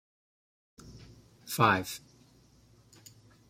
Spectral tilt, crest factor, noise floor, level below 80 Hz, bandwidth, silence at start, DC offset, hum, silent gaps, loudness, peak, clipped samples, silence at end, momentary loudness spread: -4.5 dB/octave; 26 dB; -62 dBFS; -64 dBFS; 16 kHz; 0.85 s; under 0.1%; none; none; -28 LUFS; -10 dBFS; under 0.1%; 1.5 s; 27 LU